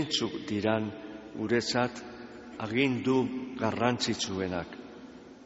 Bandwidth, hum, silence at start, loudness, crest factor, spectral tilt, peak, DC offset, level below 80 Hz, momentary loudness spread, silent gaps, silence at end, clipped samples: 8 kHz; none; 0 s; -30 LUFS; 20 dB; -3.5 dB/octave; -10 dBFS; under 0.1%; -62 dBFS; 17 LU; none; 0 s; under 0.1%